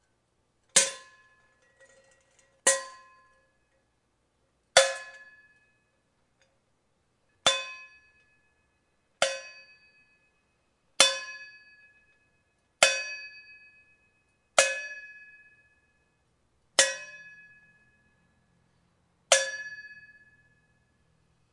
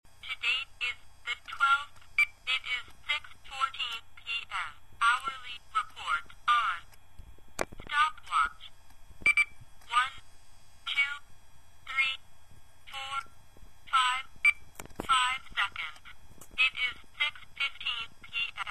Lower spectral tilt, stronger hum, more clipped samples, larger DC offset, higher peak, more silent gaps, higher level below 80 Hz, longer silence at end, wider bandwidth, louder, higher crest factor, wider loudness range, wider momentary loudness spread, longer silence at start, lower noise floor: second, 1.5 dB/octave vs 0 dB/octave; neither; neither; second, under 0.1% vs 0.4%; first, 0 dBFS vs -10 dBFS; neither; second, -76 dBFS vs -58 dBFS; first, 1.6 s vs 0 s; second, 11.5 kHz vs 15.5 kHz; first, -25 LUFS vs -30 LUFS; first, 34 dB vs 22 dB; first, 6 LU vs 3 LU; first, 24 LU vs 14 LU; first, 0.75 s vs 0.15 s; first, -73 dBFS vs -55 dBFS